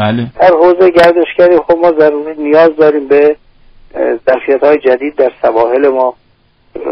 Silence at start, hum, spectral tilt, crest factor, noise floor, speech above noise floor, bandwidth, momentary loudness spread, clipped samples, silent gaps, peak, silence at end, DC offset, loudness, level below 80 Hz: 0 s; none; -7.5 dB/octave; 10 dB; -50 dBFS; 42 dB; 6 kHz; 9 LU; under 0.1%; none; 0 dBFS; 0 s; under 0.1%; -9 LUFS; -46 dBFS